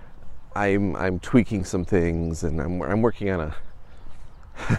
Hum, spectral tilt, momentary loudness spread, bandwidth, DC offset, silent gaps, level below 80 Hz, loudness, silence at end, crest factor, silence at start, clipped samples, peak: none; -7 dB/octave; 11 LU; 12 kHz; under 0.1%; none; -38 dBFS; -24 LUFS; 0 s; 20 dB; 0 s; under 0.1%; -4 dBFS